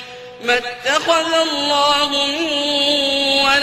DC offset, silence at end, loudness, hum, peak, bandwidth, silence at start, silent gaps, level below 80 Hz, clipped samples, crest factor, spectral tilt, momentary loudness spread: under 0.1%; 0 s; -16 LUFS; none; -2 dBFS; 15.5 kHz; 0 s; none; -52 dBFS; under 0.1%; 14 dB; -1 dB/octave; 4 LU